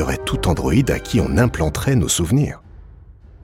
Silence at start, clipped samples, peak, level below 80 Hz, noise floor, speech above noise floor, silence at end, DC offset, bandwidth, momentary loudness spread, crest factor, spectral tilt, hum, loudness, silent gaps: 0 s; under 0.1%; -4 dBFS; -30 dBFS; -42 dBFS; 25 dB; 0.3 s; under 0.1%; 16.5 kHz; 4 LU; 16 dB; -5.5 dB/octave; none; -18 LUFS; none